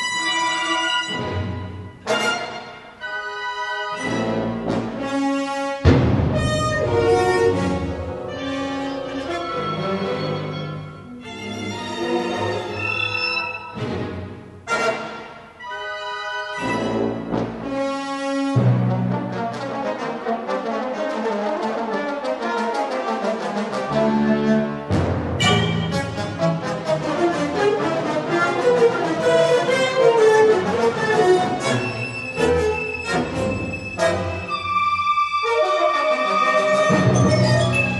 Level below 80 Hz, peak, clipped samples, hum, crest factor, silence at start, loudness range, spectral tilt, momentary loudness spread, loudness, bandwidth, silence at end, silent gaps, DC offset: -42 dBFS; -2 dBFS; under 0.1%; none; 18 dB; 0 s; 8 LU; -5.5 dB/octave; 11 LU; -21 LUFS; 11.5 kHz; 0 s; none; under 0.1%